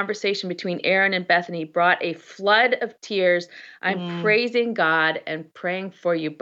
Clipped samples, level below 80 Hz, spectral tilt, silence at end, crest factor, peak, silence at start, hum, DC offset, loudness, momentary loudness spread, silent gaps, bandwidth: under 0.1%; -82 dBFS; -5 dB/octave; 0.05 s; 18 dB; -6 dBFS; 0 s; none; under 0.1%; -22 LUFS; 9 LU; none; 7.8 kHz